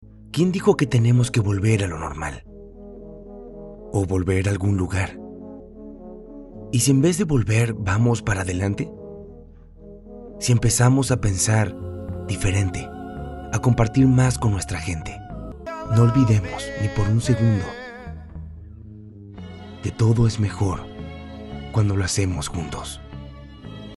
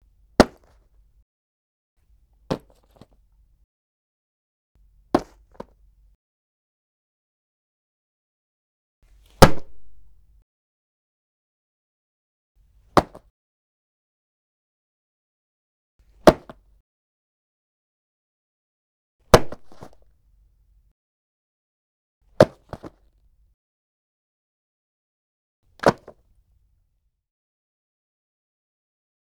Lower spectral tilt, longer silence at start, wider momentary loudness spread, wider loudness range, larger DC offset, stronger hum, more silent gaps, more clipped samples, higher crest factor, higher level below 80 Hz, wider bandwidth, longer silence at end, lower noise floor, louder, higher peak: about the same, -6 dB/octave vs -5.5 dB/octave; second, 0 s vs 0.4 s; second, 22 LU vs 25 LU; second, 5 LU vs 9 LU; neither; neither; second, none vs 1.22-1.97 s, 3.64-4.75 s, 6.15-9.02 s, 10.42-12.55 s, 13.30-15.99 s, 16.80-19.19 s, 20.91-22.21 s, 23.54-25.63 s; neither; second, 20 dB vs 28 dB; about the same, -40 dBFS vs -42 dBFS; second, 12 kHz vs over 20 kHz; second, 0 s vs 3.35 s; second, -44 dBFS vs -71 dBFS; about the same, -21 LUFS vs -20 LUFS; about the same, -2 dBFS vs 0 dBFS